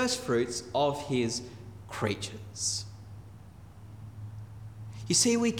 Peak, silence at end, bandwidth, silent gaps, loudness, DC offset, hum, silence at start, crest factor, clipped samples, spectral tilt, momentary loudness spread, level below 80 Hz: -12 dBFS; 0 s; 18.5 kHz; none; -30 LUFS; under 0.1%; none; 0 s; 20 dB; under 0.1%; -3.5 dB/octave; 22 LU; -60 dBFS